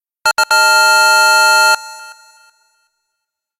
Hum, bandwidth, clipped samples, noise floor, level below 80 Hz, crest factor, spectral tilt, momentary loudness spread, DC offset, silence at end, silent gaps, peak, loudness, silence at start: none; 17.5 kHz; under 0.1%; -77 dBFS; -64 dBFS; 14 dB; 3 dB/octave; 8 LU; under 0.1%; 1.5 s; none; 0 dBFS; -9 LUFS; 0.25 s